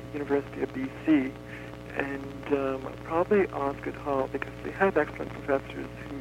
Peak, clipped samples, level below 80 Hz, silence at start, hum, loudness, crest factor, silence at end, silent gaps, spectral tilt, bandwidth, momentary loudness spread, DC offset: -8 dBFS; under 0.1%; -50 dBFS; 0 s; 60 Hz at -45 dBFS; -30 LUFS; 20 dB; 0 s; none; -7.5 dB/octave; 15.5 kHz; 12 LU; under 0.1%